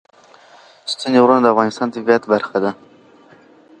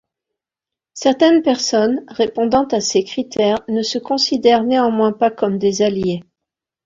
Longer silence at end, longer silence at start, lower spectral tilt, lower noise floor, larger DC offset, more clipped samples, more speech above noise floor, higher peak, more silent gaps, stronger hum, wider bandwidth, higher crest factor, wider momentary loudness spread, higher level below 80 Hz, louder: first, 1.05 s vs 0.65 s; about the same, 0.85 s vs 0.95 s; about the same, -5 dB/octave vs -4.5 dB/octave; second, -47 dBFS vs -87 dBFS; neither; neither; second, 32 dB vs 71 dB; about the same, 0 dBFS vs 0 dBFS; neither; neither; first, 9.6 kHz vs 7.8 kHz; about the same, 18 dB vs 16 dB; first, 13 LU vs 7 LU; second, -66 dBFS vs -56 dBFS; about the same, -16 LUFS vs -16 LUFS